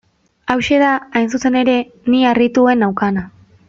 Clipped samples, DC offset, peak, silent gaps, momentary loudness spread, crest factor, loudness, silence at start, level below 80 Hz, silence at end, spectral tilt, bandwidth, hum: under 0.1%; under 0.1%; 0 dBFS; none; 7 LU; 16 dB; -15 LUFS; 0.45 s; -50 dBFS; 0.4 s; -5.5 dB/octave; 7.6 kHz; none